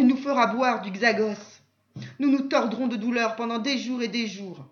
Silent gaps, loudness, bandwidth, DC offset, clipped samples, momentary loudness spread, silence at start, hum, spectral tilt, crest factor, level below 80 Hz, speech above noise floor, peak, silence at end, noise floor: none; -25 LUFS; 7 kHz; under 0.1%; under 0.1%; 10 LU; 0 s; none; -4.5 dB/octave; 18 dB; -80 dBFS; 20 dB; -6 dBFS; 0.05 s; -45 dBFS